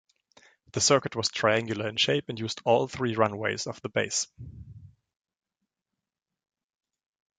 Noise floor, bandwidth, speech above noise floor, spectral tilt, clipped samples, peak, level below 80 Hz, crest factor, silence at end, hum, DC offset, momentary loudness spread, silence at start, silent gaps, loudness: -88 dBFS; 9.6 kHz; 60 dB; -3 dB/octave; under 0.1%; -6 dBFS; -60 dBFS; 24 dB; 2.55 s; none; under 0.1%; 13 LU; 0.75 s; none; -27 LUFS